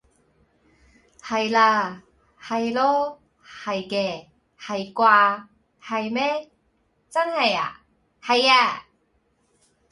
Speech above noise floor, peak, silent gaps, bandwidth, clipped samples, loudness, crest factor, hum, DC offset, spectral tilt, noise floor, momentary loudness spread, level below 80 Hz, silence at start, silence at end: 46 dB; -4 dBFS; none; 11.5 kHz; under 0.1%; -22 LUFS; 22 dB; none; under 0.1%; -3.5 dB/octave; -67 dBFS; 16 LU; -66 dBFS; 1.25 s; 1.1 s